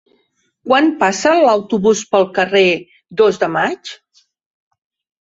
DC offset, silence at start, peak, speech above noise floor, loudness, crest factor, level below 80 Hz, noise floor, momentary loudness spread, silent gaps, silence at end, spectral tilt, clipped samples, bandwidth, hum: under 0.1%; 0.65 s; 0 dBFS; 49 dB; -14 LUFS; 16 dB; -58 dBFS; -63 dBFS; 12 LU; none; 1.3 s; -4 dB/octave; under 0.1%; 7.8 kHz; none